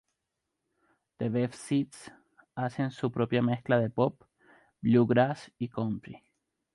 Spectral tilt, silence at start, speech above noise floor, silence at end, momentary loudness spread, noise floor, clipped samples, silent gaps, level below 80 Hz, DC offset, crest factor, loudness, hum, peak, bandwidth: -7.5 dB/octave; 1.2 s; 56 dB; 0.6 s; 13 LU; -85 dBFS; under 0.1%; none; -66 dBFS; under 0.1%; 18 dB; -30 LUFS; none; -12 dBFS; 11.5 kHz